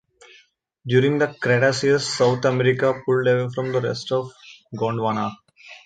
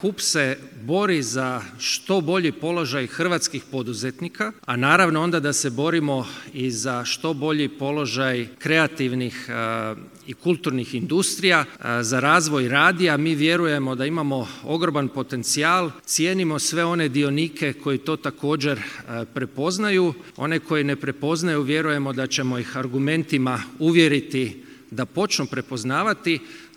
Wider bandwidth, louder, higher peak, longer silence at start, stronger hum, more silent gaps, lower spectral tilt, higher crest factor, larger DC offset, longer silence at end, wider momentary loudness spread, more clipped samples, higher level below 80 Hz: second, 9.2 kHz vs 17 kHz; about the same, -21 LUFS vs -22 LUFS; second, -4 dBFS vs 0 dBFS; first, 0.85 s vs 0 s; neither; neither; first, -5.5 dB/octave vs -4 dB/octave; about the same, 18 dB vs 22 dB; neither; about the same, 0.1 s vs 0.1 s; about the same, 9 LU vs 10 LU; neither; first, -62 dBFS vs -70 dBFS